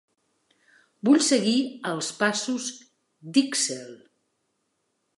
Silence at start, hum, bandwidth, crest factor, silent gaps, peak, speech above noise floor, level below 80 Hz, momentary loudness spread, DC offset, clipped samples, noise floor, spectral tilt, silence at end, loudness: 1.05 s; none; 11.5 kHz; 20 dB; none; -6 dBFS; 51 dB; -82 dBFS; 12 LU; under 0.1%; under 0.1%; -75 dBFS; -3 dB/octave; 1.2 s; -24 LUFS